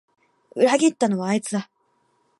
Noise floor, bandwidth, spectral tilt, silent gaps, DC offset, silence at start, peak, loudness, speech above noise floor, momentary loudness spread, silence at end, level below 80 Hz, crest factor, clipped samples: -67 dBFS; 11.5 kHz; -5 dB/octave; none; under 0.1%; 0.55 s; -6 dBFS; -21 LUFS; 46 dB; 12 LU; 0.75 s; -76 dBFS; 18 dB; under 0.1%